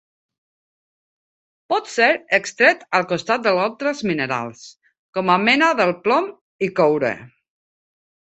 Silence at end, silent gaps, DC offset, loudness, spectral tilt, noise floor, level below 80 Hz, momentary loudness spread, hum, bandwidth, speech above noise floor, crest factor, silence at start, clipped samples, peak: 1.1 s; 4.99-5.13 s, 6.41-6.59 s; under 0.1%; -19 LUFS; -4.5 dB/octave; under -90 dBFS; -66 dBFS; 10 LU; none; 8.4 kHz; over 71 dB; 20 dB; 1.7 s; under 0.1%; 0 dBFS